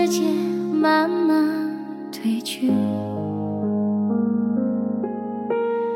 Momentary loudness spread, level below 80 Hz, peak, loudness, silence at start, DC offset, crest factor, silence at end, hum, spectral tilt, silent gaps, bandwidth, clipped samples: 8 LU; -72 dBFS; -8 dBFS; -22 LUFS; 0 s; under 0.1%; 14 dB; 0 s; none; -6 dB/octave; none; 16.5 kHz; under 0.1%